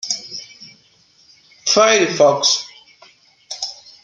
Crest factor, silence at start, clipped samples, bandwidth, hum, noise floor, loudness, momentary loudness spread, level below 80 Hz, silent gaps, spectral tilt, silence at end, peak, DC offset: 18 dB; 0.05 s; under 0.1%; 10.5 kHz; none; -54 dBFS; -16 LUFS; 20 LU; -68 dBFS; none; -1.5 dB/octave; 0.3 s; -2 dBFS; under 0.1%